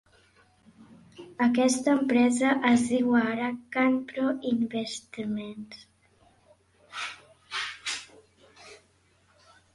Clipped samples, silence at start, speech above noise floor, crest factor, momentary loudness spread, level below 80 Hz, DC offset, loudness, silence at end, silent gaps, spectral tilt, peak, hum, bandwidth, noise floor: under 0.1%; 0.8 s; 39 dB; 22 dB; 19 LU; -68 dBFS; under 0.1%; -27 LUFS; 1 s; none; -4 dB/octave; -8 dBFS; none; 11.5 kHz; -65 dBFS